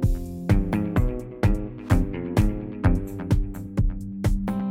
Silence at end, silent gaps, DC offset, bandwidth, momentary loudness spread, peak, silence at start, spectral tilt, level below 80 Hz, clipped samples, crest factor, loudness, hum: 0 s; none; under 0.1%; 15.5 kHz; 5 LU; -6 dBFS; 0 s; -8 dB/octave; -28 dBFS; under 0.1%; 16 dB; -26 LUFS; none